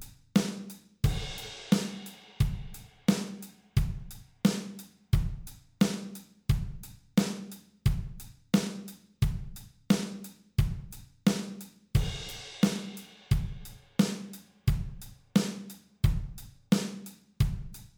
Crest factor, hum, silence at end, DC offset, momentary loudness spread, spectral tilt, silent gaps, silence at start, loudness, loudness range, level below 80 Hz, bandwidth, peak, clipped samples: 20 dB; none; 0.1 s; under 0.1%; 17 LU; -6 dB/octave; none; 0 s; -32 LUFS; 1 LU; -40 dBFS; over 20 kHz; -10 dBFS; under 0.1%